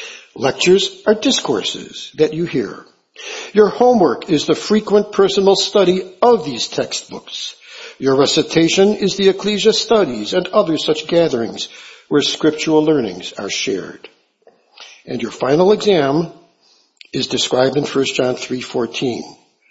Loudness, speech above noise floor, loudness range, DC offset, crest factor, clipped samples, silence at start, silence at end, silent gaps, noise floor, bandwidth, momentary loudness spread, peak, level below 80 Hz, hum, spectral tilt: -16 LUFS; 40 dB; 4 LU; under 0.1%; 16 dB; under 0.1%; 0 s; 0.4 s; none; -56 dBFS; 8 kHz; 14 LU; 0 dBFS; -56 dBFS; none; -4 dB/octave